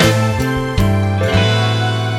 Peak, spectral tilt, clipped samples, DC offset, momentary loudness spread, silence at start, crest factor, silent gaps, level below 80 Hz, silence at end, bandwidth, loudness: 0 dBFS; -5.5 dB/octave; under 0.1%; under 0.1%; 4 LU; 0 s; 14 dB; none; -30 dBFS; 0 s; 16 kHz; -15 LUFS